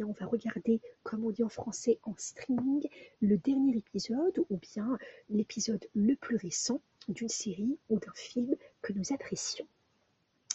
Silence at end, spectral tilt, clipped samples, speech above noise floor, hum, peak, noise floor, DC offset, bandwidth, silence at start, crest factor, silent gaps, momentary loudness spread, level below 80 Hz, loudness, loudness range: 0 s; -4.5 dB/octave; under 0.1%; 41 dB; none; -12 dBFS; -74 dBFS; under 0.1%; 8.2 kHz; 0 s; 22 dB; none; 9 LU; -72 dBFS; -34 LUFS; 4 LU